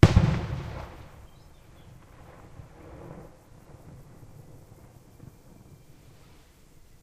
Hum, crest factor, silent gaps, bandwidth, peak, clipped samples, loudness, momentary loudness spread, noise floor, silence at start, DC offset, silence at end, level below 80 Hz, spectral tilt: none; 28 dB; none; 12.5 kHz; -2 dBFS; under 0.1%; -28 LUFS; 22 LU; -54 dBFS; 0.05 s; under 0.1%; 3.8 s; -40 dBFS; -7.5 dB/octave